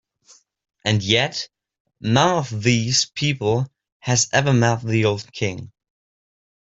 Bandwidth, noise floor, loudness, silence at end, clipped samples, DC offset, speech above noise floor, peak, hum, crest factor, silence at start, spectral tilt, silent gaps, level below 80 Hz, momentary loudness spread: 8 kHz; -55 dBFS; -20 LUFS; 1.1 s; under 0.1%; under 0.1%; 35 dB; -2 dBFS; none; 20 dB; 0.85 s; -4 dB/octave; 1.80-1.85 s, 3.92-4.00 s; -56 dBFS; 13 LU